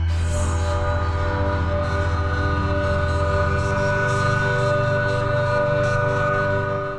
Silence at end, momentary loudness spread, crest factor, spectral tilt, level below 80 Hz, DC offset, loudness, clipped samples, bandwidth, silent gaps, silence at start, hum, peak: 0 s; 3 LU; 12 dB; -6.5 dB/octave; -30 dBFS; 0.5%; -21 LUFS; under 0.1%; 10.5 kHz; none; 0 s; none; -8 dBFS